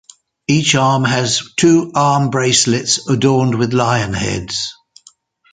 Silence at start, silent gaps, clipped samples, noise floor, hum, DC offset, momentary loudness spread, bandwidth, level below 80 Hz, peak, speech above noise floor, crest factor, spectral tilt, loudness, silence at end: 0.5 s; none; under 0.1%; -50 dBFS; none; under 0.1%; 8 LU; 9.6 kHz; -46 dBFS; 0 dBFS; 35 dB; 16 dB; -4 dB/octave; -14 LUFS; 0.8 s